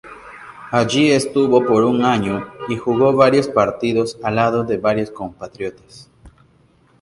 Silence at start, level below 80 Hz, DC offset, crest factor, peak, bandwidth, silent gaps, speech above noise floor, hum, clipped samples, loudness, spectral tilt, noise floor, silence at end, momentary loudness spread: 0.05 s; -52 dBFS; under 0.1%; 18 dB; 0 dBFS; 11.5 kHz; none; 38 dB; none; under 0.1%; -17 LUFS; -5.5 dB/octave; -54 dBFS; 0.75 s; 16 LU